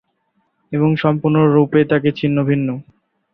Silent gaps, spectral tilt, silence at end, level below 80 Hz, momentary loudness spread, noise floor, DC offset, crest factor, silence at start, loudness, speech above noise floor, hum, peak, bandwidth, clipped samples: none; -10.5 dB/octave; 0.5 s; -54 dBFS; 9 LU; -66 dBFS; under 0.1%; 14 dB; 0.7 s; -16 LUFS; 51 dB; none; -2 dBFS; 5.4 kHz; under 0.1%